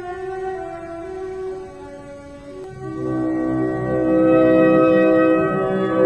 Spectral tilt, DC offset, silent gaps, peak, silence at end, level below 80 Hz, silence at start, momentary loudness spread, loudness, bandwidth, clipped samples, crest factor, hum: -8.5 dB/octave; 0.1%; none; -4 dBFS; 0 s; -48 dBFS; 0 s; 22 LU; -18 LUFS; 8.4 kHz; under 0.1%; 16 dB; none